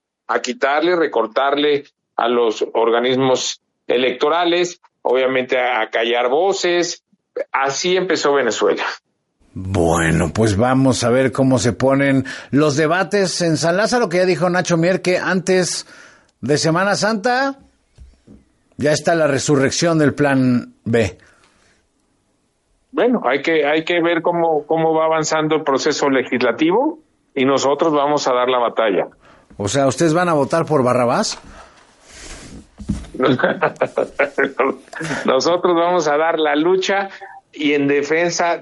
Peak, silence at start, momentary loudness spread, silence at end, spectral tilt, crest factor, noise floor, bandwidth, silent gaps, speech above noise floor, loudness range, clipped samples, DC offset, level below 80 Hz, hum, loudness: 0 dBFS; 0.3 s; 8 LU; 0 s; -4.5 dB/octave; 16 dB; -64 dBFS; 11.5 kHz; none; 48 dB; 4 LU; under 0.1%; under 0.1%; -50 dBFS; none; -17 LUFS